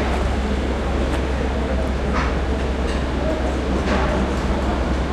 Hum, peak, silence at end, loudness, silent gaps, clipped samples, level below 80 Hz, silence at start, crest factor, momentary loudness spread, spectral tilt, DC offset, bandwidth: none; -8 dBFS; 0 s; -22 LUFS; none; under 0.1%; -24 dBFS; 0 s; 12 dB; 2 LU; -6.5 dB/octave; under 0.1%; 10.5 kHz